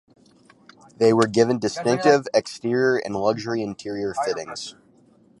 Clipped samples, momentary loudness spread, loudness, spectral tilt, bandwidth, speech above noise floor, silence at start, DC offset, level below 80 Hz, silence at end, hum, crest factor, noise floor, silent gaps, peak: under 0.1%; 12 LU; -22 LUFS; -5 dB/octave; 11.5 kHz; 35 dB; 1 s; under 0.1%; -62 dBFS; 0.7 s; none; 20 dB; -56 dBFS; none; -2 dBFS